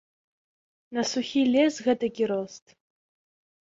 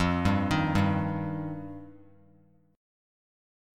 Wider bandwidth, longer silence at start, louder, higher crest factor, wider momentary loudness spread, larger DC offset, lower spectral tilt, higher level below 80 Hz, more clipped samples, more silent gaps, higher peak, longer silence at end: second, 7.8 kHz vs 13 kHz; first, 0.9 s vs 0 s; about the same, -26 LUFS vs -28 LUFS; about the same, 18 dB vs 20 dB; second, 10 LU vs 16 LU; neither; second, -4 dB/octave vs -7 dB/octave; second, -70 dBFS vs -48 dBFS; neither; neither; about the same, -10 dBFS vs -12 dBFS; about the same, 1.05 s vs 0.95 s